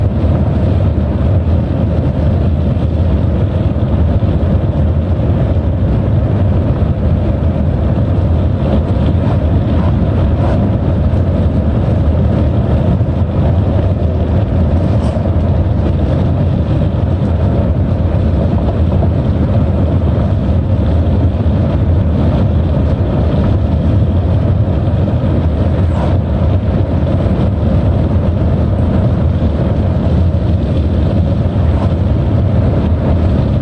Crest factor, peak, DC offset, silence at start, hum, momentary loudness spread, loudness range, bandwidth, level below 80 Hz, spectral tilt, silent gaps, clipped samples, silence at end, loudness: 8 dB; -4 dBFS; under 0.1%; 0 s; none; 1 LU; 1 LU; 5 kHz; -20 dBFS; -10.5 dB/octave; none; under 0.1%; 0 s; -13 LUFS